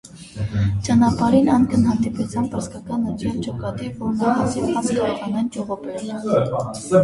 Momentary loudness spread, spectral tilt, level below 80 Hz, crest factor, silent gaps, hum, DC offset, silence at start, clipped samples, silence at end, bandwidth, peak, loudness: 11 LU; -7 dB/octave; -42 dBFS; 18 dB; none; none; under 0.1%; 0.05 s; under 0.1%; 0 s; 11.5 kHz; -2 dBFS; -21 LUFS